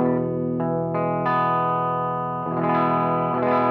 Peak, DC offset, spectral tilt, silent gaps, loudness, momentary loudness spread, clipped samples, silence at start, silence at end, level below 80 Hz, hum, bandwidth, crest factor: -8 dBFS; under 0.1%; -10.5 dB/octave; none; -23 LUFS; 4 LU; under 0.1%; 0 s; 0 s; -58 dBFS; none; 5.2 kHz; 14 dB